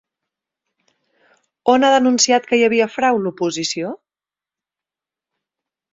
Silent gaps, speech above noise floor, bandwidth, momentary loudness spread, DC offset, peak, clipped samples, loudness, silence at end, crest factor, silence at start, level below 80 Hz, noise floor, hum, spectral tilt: none; over 74 dB; 7.8 kHz; 10 LU; under 0.1%; -2 dBFS; under 0.1%; -16 LUFS; 2 s; 18 dB; 1.65 s; -66 dBFS; under -90 dBFS; none; -3 dB/octave